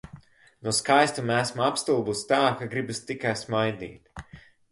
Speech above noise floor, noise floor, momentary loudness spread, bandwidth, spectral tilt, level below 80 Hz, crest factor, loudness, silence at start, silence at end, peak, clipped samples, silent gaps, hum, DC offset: 25 dB; -51 dBFS; 18 LU; 12 kHz; -4 dB/octave; -58 dBFS; 22 dB; -25 LUFS; 0.15 s; 0.3 s; -6 dBFS; under 0.1%; none; none; under 0.1%